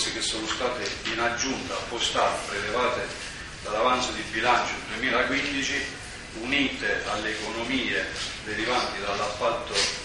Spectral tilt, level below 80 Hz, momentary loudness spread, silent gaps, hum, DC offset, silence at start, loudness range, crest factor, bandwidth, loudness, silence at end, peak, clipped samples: -2.5 dB/octave; -48 dBFS; 8 LU; none; none; under 0.1%; 0 s; 2 LU; 20 dB; 11.5 kHz; -26 LUFS; 0 s; -8 dBFS; under 0.1%